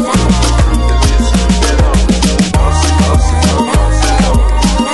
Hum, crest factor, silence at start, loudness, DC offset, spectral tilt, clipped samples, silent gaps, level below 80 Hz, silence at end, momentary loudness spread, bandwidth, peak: none; 8 dB; 0 s; -11 LUFS; under 0.1%; -5 dB/octave; under 0.1%; none; -12 dBFS; 0 s; 1 LU; 12 kHz; 0 dBFS